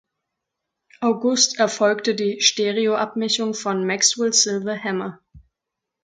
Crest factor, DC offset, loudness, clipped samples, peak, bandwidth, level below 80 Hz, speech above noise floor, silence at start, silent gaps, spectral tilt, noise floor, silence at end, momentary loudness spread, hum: 22 dB; under 0.1%; -20 LUFS; under 0.1%; 0 dBFS; 11 kHz; -62 dBFS; 63 dB; 1 s; none; -2 dB/octave; -83 dBFS; 0.65 s; 8 LU; none